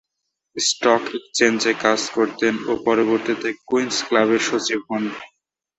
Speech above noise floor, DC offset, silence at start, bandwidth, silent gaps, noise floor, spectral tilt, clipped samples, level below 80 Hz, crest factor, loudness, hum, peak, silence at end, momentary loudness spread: 59 dB; under 0.1%; 0.55 s; 8.2 kHz; none; -79 dBFS; -2.5 dB/octave; under 0.1%; -64 dBFS; 20 dB; -20 LUFS; none; -2 dBFS; 0.5 s; 8 LU